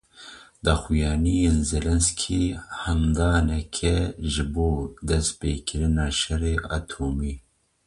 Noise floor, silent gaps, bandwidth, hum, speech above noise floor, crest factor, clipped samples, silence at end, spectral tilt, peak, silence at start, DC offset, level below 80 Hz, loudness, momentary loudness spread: -46 dBFS; none; 11.5 kHz; none; 23 dB; 18 dB; under 0.1%; 0.45 s; -5 dB/octave; -6 dBFS; 0.2 s; under 0.1%; -30 dBFS; -25 LUFS; 9 LU